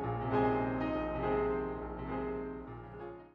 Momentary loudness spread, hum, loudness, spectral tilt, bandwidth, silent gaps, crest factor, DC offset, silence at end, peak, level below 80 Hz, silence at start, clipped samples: 15 LU; none; -35 LUFS; -6.5 dB/octave; 5.4 kHz; none; 16 dB; under 0.1%; 0.05 s; -20 dBFS; -50 dBFS; 0 s; under 0.1%